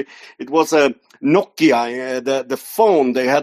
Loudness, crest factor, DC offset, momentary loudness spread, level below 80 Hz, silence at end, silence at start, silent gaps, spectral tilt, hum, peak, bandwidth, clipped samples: -17 LUFS; 16 dB; under 0.1%; 9 LU; -66 dBFS; 0 s; 0 s; none; -4.5 dB/octave; none; -2 dBFS; 14.5 kHz; under 0.1%